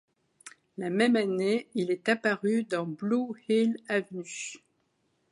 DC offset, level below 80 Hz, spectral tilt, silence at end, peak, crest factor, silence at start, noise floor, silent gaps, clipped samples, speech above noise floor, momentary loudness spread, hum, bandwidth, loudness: under 0.1%; -80 dBFS; -5 dB/octave; 0.75 s; -10 dBFS; 20 dB; 0.45 s; -74 dBFS; none; under 0.1%; 46 dB; 13 LU; none; 11.5 kHz; -29 LUFS